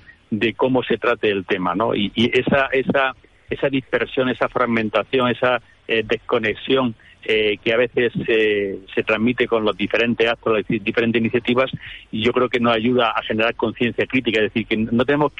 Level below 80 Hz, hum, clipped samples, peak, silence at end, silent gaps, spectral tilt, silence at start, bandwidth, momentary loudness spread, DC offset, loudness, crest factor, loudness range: -50 dBFS; none; under 0.1%; -6 dBFS; 0.1 s; none; -7 dB/octave; 0.1 s; 8 kHz; 4 LU; under 0.1%; -19 LUFS; 14 dB; 1 LU